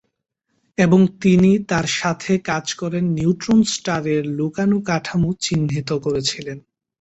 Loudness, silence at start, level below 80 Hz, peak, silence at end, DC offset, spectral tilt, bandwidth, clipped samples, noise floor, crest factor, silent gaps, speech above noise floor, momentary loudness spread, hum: -19 LUFS; 0.8 s; -50 dBFS; -2 dBFS; 0.4 s; under 0.1%; -5.5 dB/octave; 8.2 kHz; under 0.1%; -73 dBFS; 16 dB; none; 55 dB; 8 LU; none